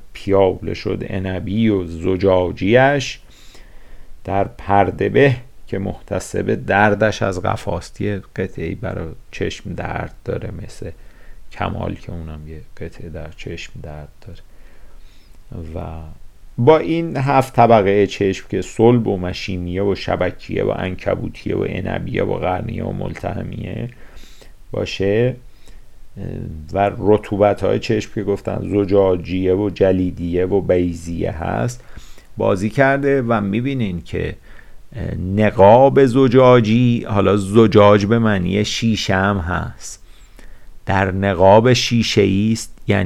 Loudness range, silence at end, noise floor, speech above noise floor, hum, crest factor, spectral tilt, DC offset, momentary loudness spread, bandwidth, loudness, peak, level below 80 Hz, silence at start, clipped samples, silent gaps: 14 LU; 0 s; -39 dBFS; 22 dB; none; 18 dB; -6.5 dB/octave; under 0.1%; 19 LU; 13.5 kHz; -17 LUFS; 0 dBFS; -38 dBFS; 0 s; under 0.1%; none